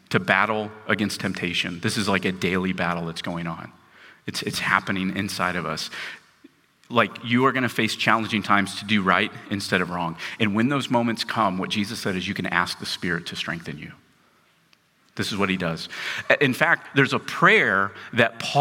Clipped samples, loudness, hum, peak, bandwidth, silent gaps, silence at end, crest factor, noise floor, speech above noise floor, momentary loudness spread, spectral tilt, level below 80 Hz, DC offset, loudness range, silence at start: under 0.1%; -23 LUFS; none; -2 dBFS; 17 kHz; none; 0 s; 22 dB; -61 dBFS; 38 dB; 10 LU; -4.5 dB/octave; -62 dBFS; under 0.1%; 7 LU; 0.1 s